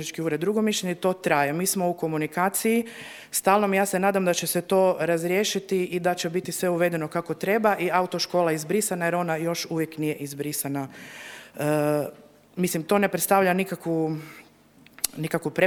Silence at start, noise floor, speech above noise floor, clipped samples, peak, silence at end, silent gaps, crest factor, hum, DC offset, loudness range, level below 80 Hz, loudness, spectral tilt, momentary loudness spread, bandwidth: 0 s; -55 dBFS; 30 dB; under 0.1%; 0 dBFS; 0 s; none; 24 dB; none; under 0.1%; 5 LU; -68 dBFS; -25 LUFS; -4.5 dB/octave; 9 LU; over 20 kHz